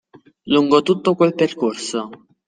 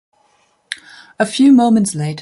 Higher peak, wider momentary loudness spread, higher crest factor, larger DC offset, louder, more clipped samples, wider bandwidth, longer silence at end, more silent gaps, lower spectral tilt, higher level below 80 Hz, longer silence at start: about the same, -2 dBFS vs 0 dBFS; second, 11 LU vs 19 LU; about the same, 18 dB vs 14 dB; neither; second, -18 LUFS vs -13 LUFS; neither; second, 9.6 kHz vs 11.5 kHz; first, 0.35 s vs 0 s; neither; about the same, -5.5 dB/octave vs -5 dB/octave; about the same, -62 dBFS vs -60 dBFS; second, 0.45 s vs 0.7 s